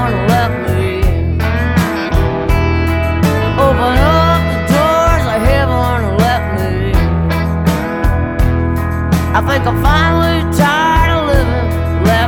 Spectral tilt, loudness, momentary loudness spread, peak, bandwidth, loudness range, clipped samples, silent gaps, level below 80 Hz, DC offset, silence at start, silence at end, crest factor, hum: -6.5 dB/octave; -13 LUFS; 4 LU; 0 dBFS; 17.5 kHz; 2 LU; under 0.1%; none; -18 dBFS; under 0.1%; 0 s; 0 s; 12 dB; none